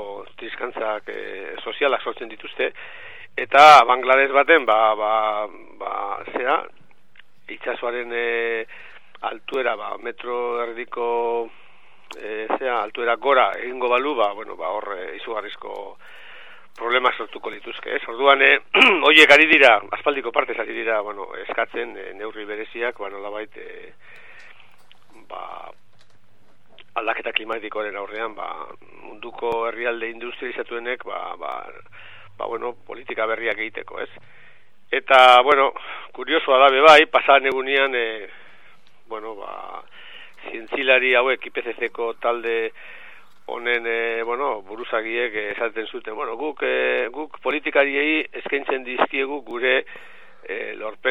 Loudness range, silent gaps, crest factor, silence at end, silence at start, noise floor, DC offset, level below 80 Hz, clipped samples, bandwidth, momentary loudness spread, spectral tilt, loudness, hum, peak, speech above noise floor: 14 LU; none; 22 dB; 0 s; 0 s; -60 dBFS; 0.9%; -68 dBFS; under 0.1%; 14 kHz; 21 LU; -2.5 dB/octave; -19 LUFS; none; 0 dBFS; 40 dB